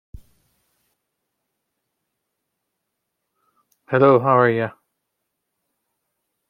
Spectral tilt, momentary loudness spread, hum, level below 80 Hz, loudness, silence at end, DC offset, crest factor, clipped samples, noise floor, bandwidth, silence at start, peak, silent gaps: -9.5 dB/octave; 11 LU; none; -58 dBFS; -17 LUFS; 1.8 s; under 0.1%; 22 dB; under 0.1%; -78 dBFS; 5.4 kHz; 3.9 s; -2 dBFS; none